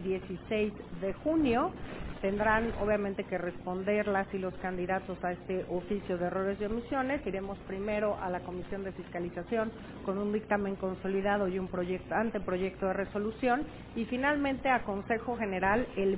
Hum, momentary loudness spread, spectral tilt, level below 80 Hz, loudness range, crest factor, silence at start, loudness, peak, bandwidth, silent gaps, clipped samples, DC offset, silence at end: none; 9 LU; -5 dB/octave; -52 dBFS; 3 LU; 18 dB; 0 s; -33 LUFS; -14 dBFS; 4 kHz; none; under 0.1%; under 0.1%; 0 s